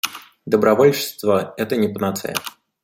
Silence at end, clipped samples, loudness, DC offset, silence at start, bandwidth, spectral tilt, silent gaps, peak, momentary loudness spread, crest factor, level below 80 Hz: 0.35 s; under 0.1%; -19 LUFS; under 0.1%; 0.05 s; 16.5 kHz; -4.5 dB/octave; none; -2 dBFS; 13 LU; 18 dB; -62 dBFS